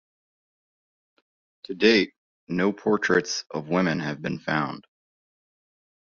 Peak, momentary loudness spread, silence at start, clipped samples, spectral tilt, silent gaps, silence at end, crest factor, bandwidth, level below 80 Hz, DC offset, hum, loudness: -4 dBFS; 12 LU; 1.7 s; under 0.1%; -3.5 dB/octave; 2.18-2.47 s; 1.2 s; 24 dB; 7.4 kHz; -64 dBFS; under 0.1%; none; -24 LUFS